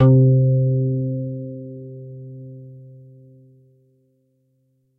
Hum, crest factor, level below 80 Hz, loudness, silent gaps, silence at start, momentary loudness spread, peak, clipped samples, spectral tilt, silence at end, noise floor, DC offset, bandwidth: none; 18 dB; -56 dBFS; -19 LUFS; none; 0 s; 25 LU; -4 dBFS; under 0.1%; -13 dB/octave; 2.15 s; -65 dBFS; under 0.1%; 1.5 kHz